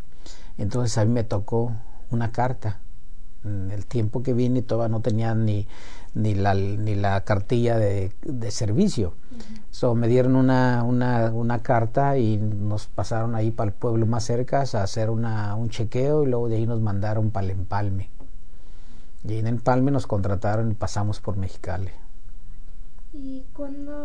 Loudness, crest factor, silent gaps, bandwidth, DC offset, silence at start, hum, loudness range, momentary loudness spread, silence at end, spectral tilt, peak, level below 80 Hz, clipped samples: -25 LUFS; 18 dB; none; 10 kHz; 6%; 0.1 s; none; 5 LU; 13 LU; 0 s; -7.5 dB/octave; -6 dBFS; -38 dBFS; under 0.1%